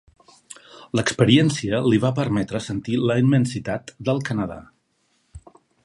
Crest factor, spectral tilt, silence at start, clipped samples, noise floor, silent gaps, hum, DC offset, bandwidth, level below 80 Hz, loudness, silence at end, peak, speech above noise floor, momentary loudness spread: 20 dB; -6 dB/octave; 0.5 s; under 0.1%; -67 dBFS; none; none; under 0.1%; 11.5 kHz; -52 dBFS; -21 LUFS; 0.45 s; -2 dBFS; 47 dB; 14 LU